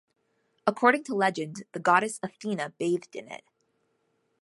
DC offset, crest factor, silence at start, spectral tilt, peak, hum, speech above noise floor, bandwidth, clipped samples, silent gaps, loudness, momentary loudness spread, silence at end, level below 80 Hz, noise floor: under 0.1%; 24 dB; 0.65 s; -4.5 dB/octave; -6 dBFS; none; 46 dB; 11.5 kHz; under 0.1%; none; -27 LUFS; 18 LU; 1.05 s; -80 dBFS; -74 dBFS